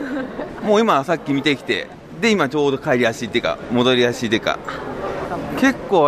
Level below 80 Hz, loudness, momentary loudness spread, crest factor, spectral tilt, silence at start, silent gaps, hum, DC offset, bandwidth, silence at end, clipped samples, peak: -48 dBFS; -19 LUFS; 10 LU; 16 dB; -5 dB/octave; 0 s; none; none; under 0.1%; 14.5 kHz; 0 s; under 0.1%; -4 dBFS